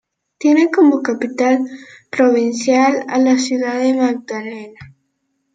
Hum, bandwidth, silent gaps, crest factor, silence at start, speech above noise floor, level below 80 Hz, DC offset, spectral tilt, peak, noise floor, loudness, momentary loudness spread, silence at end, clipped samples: none; 9.2 kHz; none; 14 dB; 0.4 s; 54 dB; -66 dBFS; under 0.1%; -4 dB/octave; -2 dBFS; -69 dBFS; -15 LUFS; 13 LU; 0.7 s; under 0.1%